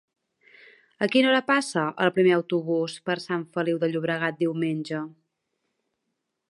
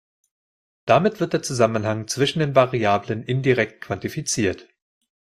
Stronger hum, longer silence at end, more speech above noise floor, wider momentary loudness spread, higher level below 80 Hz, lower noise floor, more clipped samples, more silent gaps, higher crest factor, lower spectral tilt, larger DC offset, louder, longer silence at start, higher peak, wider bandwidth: neither; first, 1.4 s vs 0.65 s; second, 56 dB vs over 69 dB; about the same, 10 LU vs 8 LU; second, -76 dBFS vs -58 dBFS; second, -80 dBFS vs under -90 dBFS; neither; neither; about the same, 20 dB vs 20 dB; about the same, -5.5 dB/octave vs -5 dB/octave; neither; second, -25 LUFS vs -21 LUFS; first, 1 s vs 0.85 s; second, -6 dBFS vs -2 dBFS; second, 11.5 kHz vs 15 kHz